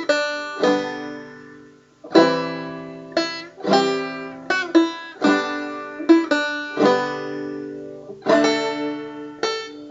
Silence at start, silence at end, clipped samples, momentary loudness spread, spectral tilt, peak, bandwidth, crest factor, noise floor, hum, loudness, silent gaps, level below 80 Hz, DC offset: 0 s; 0 s; under 0.1%; 16 LU; -4.5 dB/octave; 0 dBFS; 7.8 kHz; 22 dB; -47 dBFS; none; -21 LUFS; none; -66 dBFS; under 0.1%